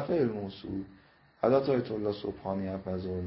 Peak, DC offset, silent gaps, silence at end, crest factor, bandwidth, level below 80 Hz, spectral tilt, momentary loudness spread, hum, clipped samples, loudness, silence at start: -12 dBFS; under 0.1%; none; 0 s; 20 dB; 5.8 kHz; -54 dBFS; -11 dB/octave; 12 LU; none; under 0.1%; -32 LUFS; 0 s